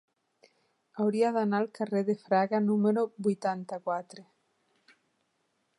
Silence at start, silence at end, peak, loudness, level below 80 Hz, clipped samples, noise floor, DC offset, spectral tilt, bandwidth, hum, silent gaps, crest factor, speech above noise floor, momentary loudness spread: 0.95 s; 1.55 s; -14 dBFS; -29 LUFS; -82 dBFS; under 0.1%; -76 dBFS; under 0.1%; -7.5 dB/octave; 11 kHz; none; none; 18 dB; 48 dB; 9 LU